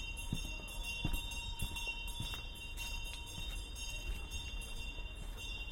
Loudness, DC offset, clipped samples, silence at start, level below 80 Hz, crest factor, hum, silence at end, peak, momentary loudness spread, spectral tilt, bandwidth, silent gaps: -43 LUFS; under 0.1%; under 0.1%; 0 s; -44 dBFS; 18 dB; none; 0 s; -24 dBFS; 5 LU; -2.5 dB/octave; 17 kHz; none